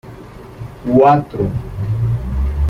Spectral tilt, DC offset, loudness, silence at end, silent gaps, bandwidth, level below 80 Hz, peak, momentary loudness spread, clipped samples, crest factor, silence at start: -9.5 dB/octave; under 0.1%; -16 LUFS; 0 s; none; 7 kHz; -26 dBFS; 0 dBFS; 24 LU; under 0.1%; 16 dB; 0.05 s